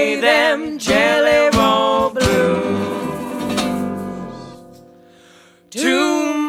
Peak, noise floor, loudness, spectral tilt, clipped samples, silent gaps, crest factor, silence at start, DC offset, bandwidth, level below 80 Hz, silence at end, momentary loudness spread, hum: 0 dBFS; -48 dBFS; -16 LUFS; -4 dB/octave; under 0.1%; none; 16 dB; 0 s; under 0.1%; 16.5 kHz; -42 dBFS; 0 s; 15 LU; none